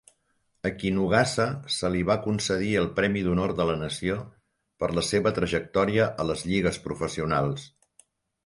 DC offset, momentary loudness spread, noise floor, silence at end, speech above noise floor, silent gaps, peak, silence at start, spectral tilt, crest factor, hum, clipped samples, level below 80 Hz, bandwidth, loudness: under 0.1%; 8 LU; -72 dBFS; 0.8 s; 46 dB; none; -8 dBFS; 0.65 s; -5 dB/octave; 20 dB; none; under 0.1%; -48 dBFS; 11.5 kHz; -26 LUFS